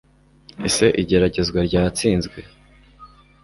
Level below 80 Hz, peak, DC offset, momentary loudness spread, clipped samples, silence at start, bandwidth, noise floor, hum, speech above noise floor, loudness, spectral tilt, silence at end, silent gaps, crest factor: -38 dBFS; -4 dBFS; under 0.1%; 11 LU; under 0.1%; 0.6 s; 12 kHz; -50 dBFS; 50 Hz at -40 dBFS; 31 dB; -19 LUFS; -5 dB/octave; 0.4 s; none; 18 dB